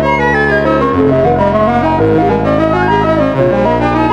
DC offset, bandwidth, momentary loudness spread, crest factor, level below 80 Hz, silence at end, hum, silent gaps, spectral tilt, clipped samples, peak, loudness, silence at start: under 0.1%; 9.8 kHz; 1 LU; 10 dB; -30 dBFS; 0 s; none; none; -8 dB/octave; under 0.1%; 0 dBFS; -11 LUFS; 0 s